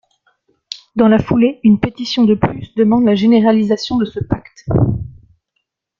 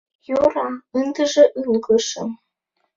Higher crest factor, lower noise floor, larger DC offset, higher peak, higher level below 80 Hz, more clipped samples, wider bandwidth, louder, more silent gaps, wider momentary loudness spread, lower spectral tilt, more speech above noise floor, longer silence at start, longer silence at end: about the same, 14 dB vs 18 dB; about the same, -72 dBFS vs -72 dBFS; neither; about the same, -2 dBFS vs -2 dBFS; first, -38 dBFS vs -58 dBFS; neither; about the same, 7.2 kHz vs 7.6 kHz; first, -14 LUFS vs -19 LUFS; neither; about the same, 12 LU vs 13 LU; first, -7.5 dB/octave vs -3.5 dB/octave; first, 58 dB vs 54 dB; first, 0.95 s vs 0.3 s; first, 0.9 s vs 0.6 s